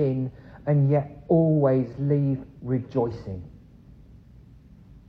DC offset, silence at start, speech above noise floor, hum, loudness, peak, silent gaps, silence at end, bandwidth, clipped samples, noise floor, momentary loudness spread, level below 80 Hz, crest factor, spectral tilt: under 0.1%; 0 s; 26 dB; none; -24 LUFS; -8 dBFS; none; 1.5 s; 4.9 kHz; under 0.1%; -50 dBFS; 14 LU; -52 dBFS; 18 dB; -12 dB/octave